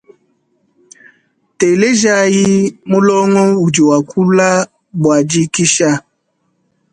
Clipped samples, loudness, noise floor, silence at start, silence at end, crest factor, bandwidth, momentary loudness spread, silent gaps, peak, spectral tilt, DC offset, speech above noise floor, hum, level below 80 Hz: under 0.1%; -12 LUFS; -64 dBFS; 1.6 s; 0.95 s; 14 dB; 11 kHz; 5 LU; none; 0 dBFS; -4.5 dB/octave; under 0.1%; 53 dB; none; -54 dBFS